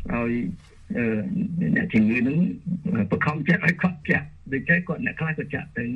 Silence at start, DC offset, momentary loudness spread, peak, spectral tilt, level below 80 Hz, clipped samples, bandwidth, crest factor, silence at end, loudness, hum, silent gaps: 0 s; under 0.1%; 9 LU; -6 dBFS; -8.5 dB/octave; -48 dBFS; under 0.1%; 6.8 kHz; 18 dB; 0 s; -24 LUFS; none; none